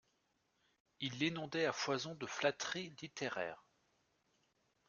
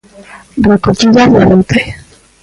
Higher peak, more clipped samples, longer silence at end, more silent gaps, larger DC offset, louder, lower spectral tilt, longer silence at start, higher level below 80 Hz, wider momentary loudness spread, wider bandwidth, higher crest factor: second, -20 dBFS vs 0 dBFS; neither; first, 1.3 s vs 0.45 s; neither; neither; second, -40 LUFS vs -8 LUFS; second, -3.5 dB/octave vs -6 dB/octave; first, 1 s vs 0.2 s; second, -82 dBFS vs -32 dBFS; second, 8 LU vs 11 LU; second, 7.4 kHz vs 11.5 kHz; first, 24 dB vs 10 dB